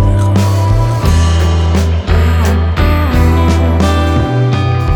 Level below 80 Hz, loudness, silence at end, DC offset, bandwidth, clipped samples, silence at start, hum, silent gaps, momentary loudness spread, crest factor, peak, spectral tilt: -16 dBFS; -11 LUFS; 0 s; under 0.1%; 13.5 kHz; under 0.1%; 0 s; none; none; 2 LU; 10 dB; 0 dBFS; -6.5 dB/octave